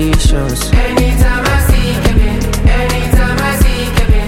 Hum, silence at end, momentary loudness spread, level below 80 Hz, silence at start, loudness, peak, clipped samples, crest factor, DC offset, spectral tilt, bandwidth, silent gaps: none; 0 s; 2 LU; -12 dBFS; 0 s; -13 LUFS; 0 dBFS; under 0.1%; 10 dB; under 0.1%; -5 dB/octave; 16.5 kHz; none